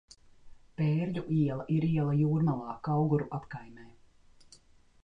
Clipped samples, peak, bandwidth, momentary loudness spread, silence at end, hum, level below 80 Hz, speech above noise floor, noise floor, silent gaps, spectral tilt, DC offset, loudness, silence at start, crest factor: under 0.1%; -16 dBFS; 7.4 kHz; 12 LU; 1.1 s; none; -62 dBFS; 30 dB; -60 dBFS; none; -9.5 dB/octave; under 0.1%; -30 LUFS; 0.45 s; 14 dB